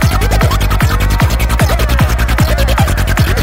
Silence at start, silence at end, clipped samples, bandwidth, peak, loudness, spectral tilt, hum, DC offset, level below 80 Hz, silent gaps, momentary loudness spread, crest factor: 0 s; 0 s; under 0.1%; 16.5 kHz; 0 dBFS; -12 LUFS; -5 dB/octave; none; under 0.1%; -14 dBFS; none; 1 LU; 10 dB